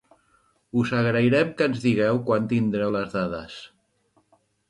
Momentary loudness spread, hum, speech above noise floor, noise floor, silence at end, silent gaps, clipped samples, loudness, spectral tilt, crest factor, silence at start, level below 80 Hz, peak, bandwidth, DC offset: 10 LU; none; 44 dB; -66 dBFS; 1.05 s; none; under 0.1%; -23 LUFS; -7.5 dB/octave; 16 dB; 0.75 s; -58 dBFS; -8 dBFS; 10.5 kHz; under 0.1%